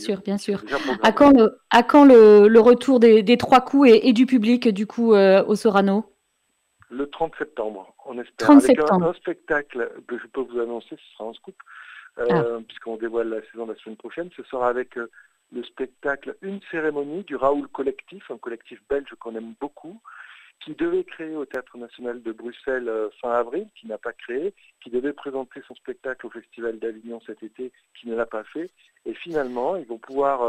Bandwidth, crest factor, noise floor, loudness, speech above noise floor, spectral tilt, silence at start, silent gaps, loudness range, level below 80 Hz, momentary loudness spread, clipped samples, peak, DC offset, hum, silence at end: 12 kHz; 20 dB; -71 dBFS; -19 LUFS; 50 dB; -6 dB/octave; 0 s; none; 18 LU; -58 dBFS; 23 LU; under 0.1%; -2 dBFS; under 0.1%; none; 0 s